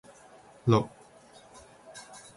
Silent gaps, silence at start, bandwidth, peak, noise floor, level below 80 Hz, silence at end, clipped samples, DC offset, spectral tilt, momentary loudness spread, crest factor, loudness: none; 0.65 s; 11.5 kHz; -8 dBFS; -55 dBFS; -64 dBFS; 0.35 s; under 0.1%; under 0.1%; -7 dB/octave; 26 LU; 24 dB; -28 LUFS